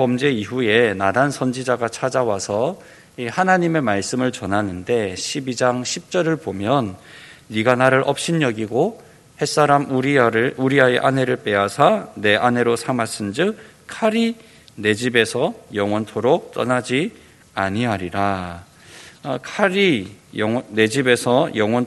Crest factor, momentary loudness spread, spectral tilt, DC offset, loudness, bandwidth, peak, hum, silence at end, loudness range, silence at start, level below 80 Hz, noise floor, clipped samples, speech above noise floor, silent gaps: 20 dB; 9 LU; -5 dB/octave; under 0.1%; -19 LUFS; 12 kHz; 0 dBFS; none; 0 s; 5 LU; 0 s; -58 dBFS; -43 dBFS; under 0.1%; 24 dB; none